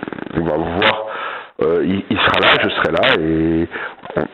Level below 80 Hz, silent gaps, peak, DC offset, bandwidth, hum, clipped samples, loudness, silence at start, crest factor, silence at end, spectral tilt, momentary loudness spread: -44 dBFS; none; 0 dBFS; under 0.1%; 7.6 kHz; none; under 0.1%; -16 LUFS; 0 s; 18 dB; 0 s; -7 dB/octave; 12 LU